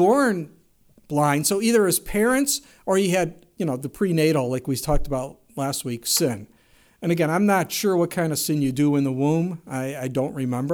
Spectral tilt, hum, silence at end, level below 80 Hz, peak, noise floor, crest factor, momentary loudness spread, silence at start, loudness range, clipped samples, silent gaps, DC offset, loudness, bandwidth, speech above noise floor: -5 dB/octave; none; 0 s; -40 dBFS; -8 dBFS; -57 dBFS; 14 dB; 10 LU; 0 s; 3 LU; under 0.1%; none; under 0.1%; -23 LUFS; over 20 kHz; 35 dB